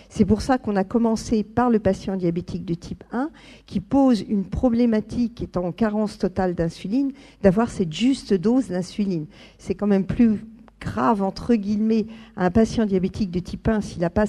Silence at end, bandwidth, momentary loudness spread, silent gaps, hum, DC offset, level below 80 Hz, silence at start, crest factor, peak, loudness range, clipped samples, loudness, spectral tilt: 0 s; 11 kHz; 10 LU; none; none; under 0.1%; -42 dBFS; 0.1 s; 20 dB; -2 dBFS; 1 LU; under 0.1%; -23 LUFS; -7 dB/octave